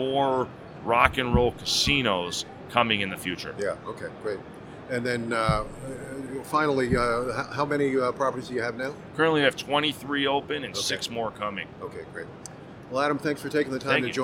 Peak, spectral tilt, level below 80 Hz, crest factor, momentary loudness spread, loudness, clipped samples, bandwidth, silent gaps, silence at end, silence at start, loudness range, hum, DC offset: 0 dBFS; -4 dB/octave; -46 dBFS; 26 dB; 15 LU; -26 LUFS; under 0.1%; 17 kHz; none; 0 s; 0 s; 6 LU; none; under 0.1%